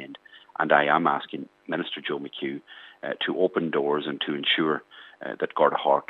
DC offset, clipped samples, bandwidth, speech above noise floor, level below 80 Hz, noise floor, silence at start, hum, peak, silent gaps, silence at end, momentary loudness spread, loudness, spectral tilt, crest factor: under 0.1%; under 0.1%; 5.2 kHz; 21 dB; -84 dBFS; -47 dBFS; 0 s; none; -4 dBFS; none; 0.05 s; 17 LU; -25 LUFS; -7 dB/octave; 24 dB